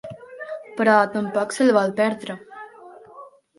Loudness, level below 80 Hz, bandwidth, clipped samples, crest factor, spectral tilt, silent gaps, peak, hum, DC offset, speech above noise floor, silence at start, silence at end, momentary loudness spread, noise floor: -20 LUFS; -70 dBFS; 11.5 kHz; under 0.1%; 20 dB; -5 dB/octave; none; -2 dBFS; none; under 0.1%; 26 dB; 0.05 s; 0.3 s; 22 LU; -45 dBFS